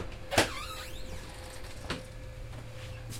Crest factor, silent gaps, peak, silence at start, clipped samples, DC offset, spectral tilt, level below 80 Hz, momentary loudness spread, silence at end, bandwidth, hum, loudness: 28 dB; none; -8 dBFS; 0 s; under 0.1%; under 0.1%; -3.5 dB/octave; -46 dBFS; 16 LU; 0 s; 16.5 kHz; none; -36 LUFS